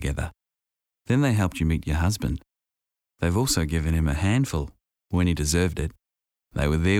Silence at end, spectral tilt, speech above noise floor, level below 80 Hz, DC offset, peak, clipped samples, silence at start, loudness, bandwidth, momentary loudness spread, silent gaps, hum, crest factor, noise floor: 0 s; -5.5 dB/octave; 65 dB; -34 dBFS; under 0.1%; -10 dBFS; under 0.1%; 0 s; -25 LUFS; 16.5 kHz; 10 LU; none; none; 14 dB; -88 dBFS